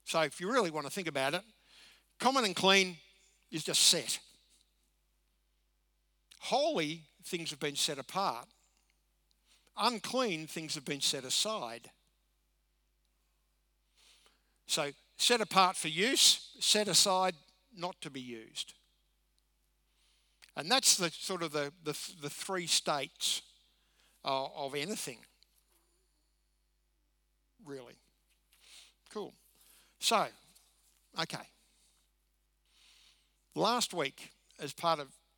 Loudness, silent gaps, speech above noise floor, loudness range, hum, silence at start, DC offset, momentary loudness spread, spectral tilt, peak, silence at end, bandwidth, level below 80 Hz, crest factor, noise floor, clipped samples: -31 LUFS; none; 43 dB; 14 LU; none; 0.05 s; under 0.1%; 19 LU; -1.5 dB/octave; -10 dBFS; 0.3 s; over 20 kHz; -78 dBFS; 26 dB; -76 dBFS; under 0.1%